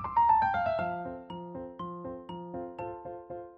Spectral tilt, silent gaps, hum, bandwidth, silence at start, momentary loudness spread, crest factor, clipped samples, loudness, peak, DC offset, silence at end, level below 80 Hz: -4.5 dB/octave; none; none; 5.2 kHz; 0 s; 17 LU; 18 dB; under 0.1%; -32 LUFS; -14 dBFS; under 0.1%; 0 s; -58 dBFS